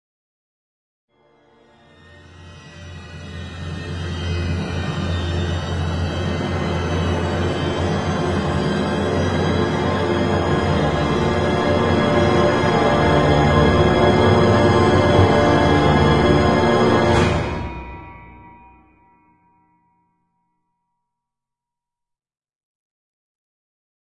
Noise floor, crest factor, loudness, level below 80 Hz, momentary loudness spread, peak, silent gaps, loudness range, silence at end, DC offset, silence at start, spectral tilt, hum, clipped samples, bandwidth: -85 dBFS; 18 dB; -18 LUFS; -36 dBFS; 14 LU; -2 dBFS; none; 14 LU; 5.7 s; under 0.1%; 2.15 s; -6.5 dB/octave; none; under 0.1%; 11 kHz